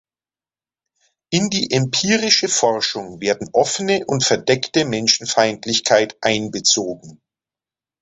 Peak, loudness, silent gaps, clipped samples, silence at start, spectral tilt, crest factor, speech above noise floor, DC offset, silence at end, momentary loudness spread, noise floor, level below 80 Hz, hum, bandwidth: 0 dBFS; -17 LUFS; none; under 0.1%; 1.3 s; -3 dB/octave; 20 dB; over 72 dB; under 0.1%; 0.85 s; 8 LU; under -90 dBFS; -56 dBFS; none; 8.4 kHz